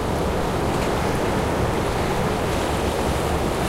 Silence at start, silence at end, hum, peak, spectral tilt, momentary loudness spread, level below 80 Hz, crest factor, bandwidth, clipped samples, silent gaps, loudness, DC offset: 0 s; 0 s; none; -10 dBFS; -5.5 dB/octave; 1 LU; -32 dBFS; 12 dB; 16 kHz; under 0.1%; none; -23 LUFS; under 0.1%